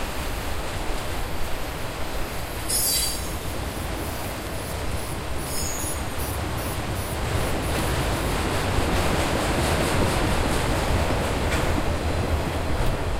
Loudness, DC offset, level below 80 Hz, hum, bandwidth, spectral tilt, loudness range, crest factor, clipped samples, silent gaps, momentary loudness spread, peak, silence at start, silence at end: -26 LUFS; under 0.1%; -30 dBFS; none; 16 kHz; -4 dB/octave; 5 LU; 16 dB; under 0.1%; none; 8 LU; -10 dBFS; 0 s; 0 s